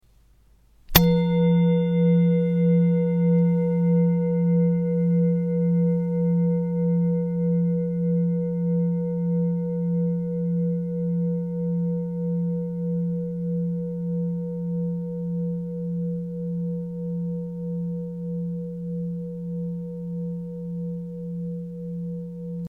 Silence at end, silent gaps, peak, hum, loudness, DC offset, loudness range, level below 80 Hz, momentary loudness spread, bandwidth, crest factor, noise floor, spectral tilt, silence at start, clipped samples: 0 s; none; 0 dBFS; none; -24 LUFS; under 0.1%; 10 LU; -48 dBFS; 12 LU; 16.5 kHz; 24 dB; -57 dBFS; -8 dB/octave; 0.9 s; under 0.1%